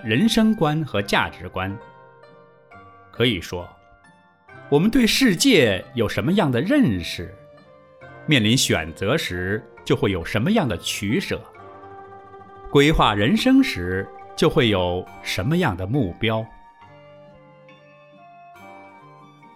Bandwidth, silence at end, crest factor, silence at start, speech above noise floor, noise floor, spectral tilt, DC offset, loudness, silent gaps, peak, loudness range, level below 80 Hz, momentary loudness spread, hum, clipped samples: 16 kHz; 0.7 s; 20 dB; 0 s; 34 dB; -54 dBFS; -5 dB/octave; under 0.1%; -20 LUFS; none; -2 dBFS; 8 LU; -42 dBFS; 16 LU; none; under 0.1%